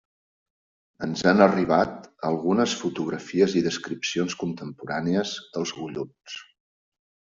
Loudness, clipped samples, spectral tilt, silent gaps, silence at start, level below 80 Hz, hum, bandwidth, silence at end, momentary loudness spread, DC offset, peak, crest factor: -25 LUFS; under 0.1%; -5 dB/octave; none; 1 s; -62 dBFS; none; 7.8 kHz; 0.95 s; 16 LU; under 0.1%; -4 dBFS; 22 dB